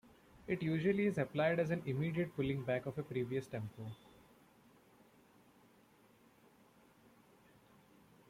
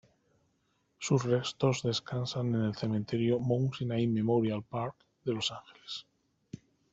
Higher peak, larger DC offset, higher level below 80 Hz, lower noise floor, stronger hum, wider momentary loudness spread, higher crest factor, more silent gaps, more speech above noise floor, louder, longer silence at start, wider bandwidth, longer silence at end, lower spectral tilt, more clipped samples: second, -22 dBFS vs -14 dBFS; neither; about the same, -70 dBFS vs -68 dBFS; second, -67 dBFS vs -75 dBFS; neither; about the same, 14 LU vs 14 LU; about the same, 18 dB vs 20 dB; neither; second, 30 dB vs 44 dB; second, -38 LUFS vs -32 LUFS; second, 0.35 s vs 1 s; first, 15.5 kHz vs 8 kHz; first, 4.35 s vs 0.35 s; first, -8 dB/octave vs -6 dB/octave; neither